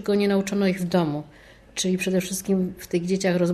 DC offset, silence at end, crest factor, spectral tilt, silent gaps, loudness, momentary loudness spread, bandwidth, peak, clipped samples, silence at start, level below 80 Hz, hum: under 0.1%; 0 s; 14 dB; -5.5 dB/octave; none; -24 LUFS; 6 LU; 13 kHz; -10 dBFS; under 0.1%; 0 s; -54 dBFS; none